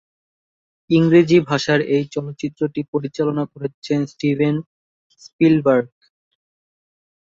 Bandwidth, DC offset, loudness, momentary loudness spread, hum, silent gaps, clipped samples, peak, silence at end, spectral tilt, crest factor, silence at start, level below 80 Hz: 7.6 kHz; under 0.1%; -18 LUFS; 13 LU; none; 2.88-2.93 s, 3.74-3.82 s, 4.66-5.10 s, 5.33-5.39 s; under 0.1%; -2 dBFS; 1.45 s; -7 dB/octave; 18 dB; 0.9 s; -60 dBFS